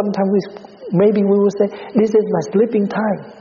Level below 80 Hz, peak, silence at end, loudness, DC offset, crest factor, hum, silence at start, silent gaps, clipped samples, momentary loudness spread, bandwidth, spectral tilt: -60 dBFS; -2 dBFS; 0 s; -17 LUFS; under 0.1%; 14 dB; none; 0 s; none; under 0.1%; 7 LU; 7.2 kHz; -8 dB/octave